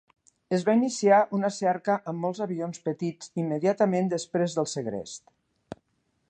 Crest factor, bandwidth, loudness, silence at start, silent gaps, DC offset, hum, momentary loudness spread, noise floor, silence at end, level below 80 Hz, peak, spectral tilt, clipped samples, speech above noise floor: 20 dB; 9.4 kHz; -27 LUFS; 0.5 s; none; under 0.1%; none; 18 LU; -73 dBFS; 0.55 s; -70 dBFS; -8 dBFS; -5.5 dB/octave; under 0.1%; 47 dB